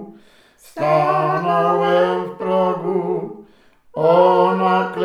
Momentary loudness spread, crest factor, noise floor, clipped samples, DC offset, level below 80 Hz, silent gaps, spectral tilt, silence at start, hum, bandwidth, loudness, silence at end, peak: 11 LU; 16 dB; -51 dBFS; under 0.1%; under 0.1%; -66 dBFS; none; -7.5 dB/octave; 0 s; none; 13.5 kHz; -17 LUFS; 0 s; -2 dBFS